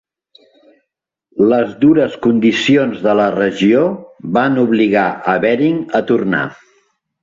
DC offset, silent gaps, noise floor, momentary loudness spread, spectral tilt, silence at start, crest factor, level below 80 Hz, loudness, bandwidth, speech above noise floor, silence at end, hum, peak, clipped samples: under 0.1%; none; -77 dBFS; 6 LU; -6.5 dB/octave; 1.35 s; 14 dB; -56 dBFS; -14 LUFS; 7.6 kHz; 64 dB; 0.7 s; none; -2 dBFS; under 0.1%